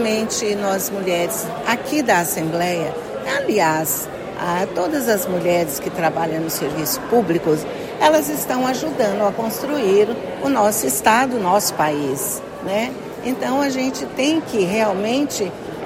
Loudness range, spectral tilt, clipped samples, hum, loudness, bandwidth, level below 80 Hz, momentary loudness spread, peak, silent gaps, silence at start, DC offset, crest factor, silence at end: 3 LU; -4 dB/octave; under 0.1%; none; -19 LUFS; 16.5 kHz; -54 dBFS; 7 LU; -2 dBFS; none; 0 s; under 0.1%; 18 dB; 0 s